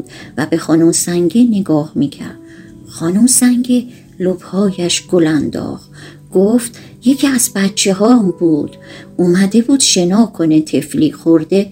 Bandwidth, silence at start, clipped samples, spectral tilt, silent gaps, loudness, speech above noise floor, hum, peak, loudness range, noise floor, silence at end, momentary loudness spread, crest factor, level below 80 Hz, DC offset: 16 kHz; 0 s; under 0.1%; -4.5 dB/octave; none; -13 LUFS; 23 dB; none; 0 dBFS; 3 LU; -35 dBFS; 0 s; 12 LU; 14 dB; -52 dBFS; under 0.1%